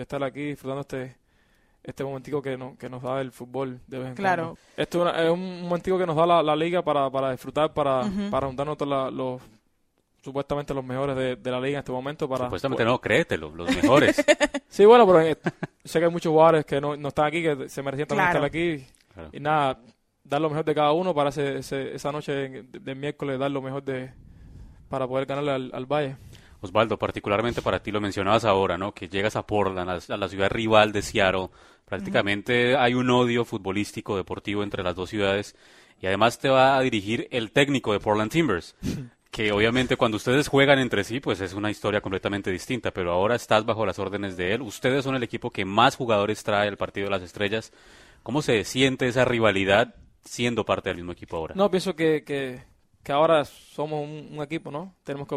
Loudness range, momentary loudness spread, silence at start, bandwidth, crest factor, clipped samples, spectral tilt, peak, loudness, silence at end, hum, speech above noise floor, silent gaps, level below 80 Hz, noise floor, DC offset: 10 LU; 14 LU; 0 s; 15 kHz; 22 dB; under 0.1%; -5.5 dB/octave; -2 dBFS; -24 LUFS; 0 s; none; 45 dB; none; -52 dBFS; -69 dBFS; under 0.1%